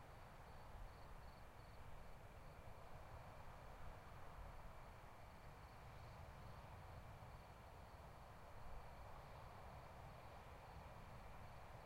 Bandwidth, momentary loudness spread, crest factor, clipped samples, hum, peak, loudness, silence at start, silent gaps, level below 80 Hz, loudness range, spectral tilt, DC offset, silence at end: 16 kHz; 2 LU; 14 dB; under 0.1%; none; -44 dBFS; -61 LUFS; 0 s; none; -64 dBFS; 1 LU; -5.5 dB/octave; under 0.1%; 0 s